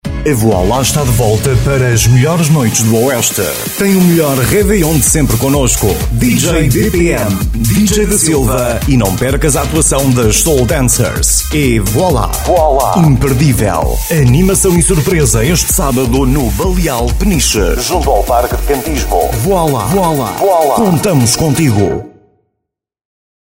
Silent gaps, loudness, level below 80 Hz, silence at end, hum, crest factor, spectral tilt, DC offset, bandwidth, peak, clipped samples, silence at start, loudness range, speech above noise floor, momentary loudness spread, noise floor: none; -10 LUFS; -20 dBFS; 1.35 s; none; 10 dB; -5 dB/octave; 0.2%; 16.5 kHz; 0 dBFS; under 0.1%; 0.05 s; 2 LU; 63 dB; 4 LU; -73 dBFS